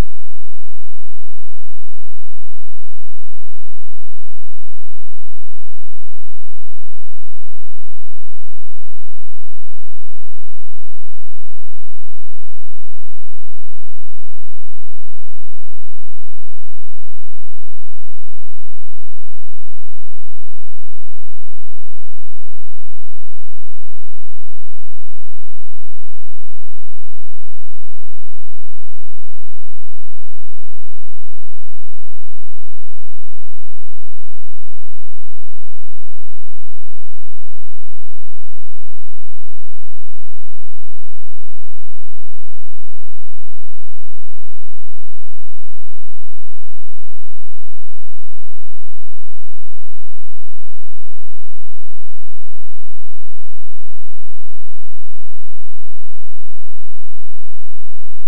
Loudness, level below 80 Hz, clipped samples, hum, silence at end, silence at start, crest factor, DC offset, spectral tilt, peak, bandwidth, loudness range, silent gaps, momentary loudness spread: -52 LUFS; -52 dBFS; under 0.1%; none; 0 s; 0 s; 4 dB; 90%; -14.5 dB/octave; 0 dBFS; 0.7 kHz; 0 LU; none; 0 LU